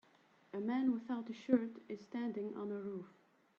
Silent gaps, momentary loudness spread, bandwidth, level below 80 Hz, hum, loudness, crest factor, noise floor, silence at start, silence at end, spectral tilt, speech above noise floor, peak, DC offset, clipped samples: none; 14 LU; 6.8 kHz; -84 dBFS; none; -40 LUFS; 20 dB; -70 dBFS; 0.55 s; 0.5 s; -8 dB/octave; 30 dB; -20 dBFS; under 0.1%; under 0.1%